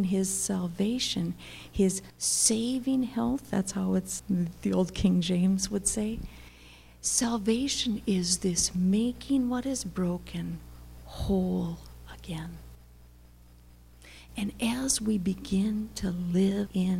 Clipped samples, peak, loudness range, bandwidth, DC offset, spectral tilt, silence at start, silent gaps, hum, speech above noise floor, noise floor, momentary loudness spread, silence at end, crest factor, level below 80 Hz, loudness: under 0.1%; -10 dBFS; 8 LU; 16 kHz; under 0.1%; -4.5 dB/octave; 0 s; none; 60 Hz at -45 dBFS; 25 dB; -54 dBFS; 13 LU; 0 s; 18 dB; -48 dBFS; -29 LUFS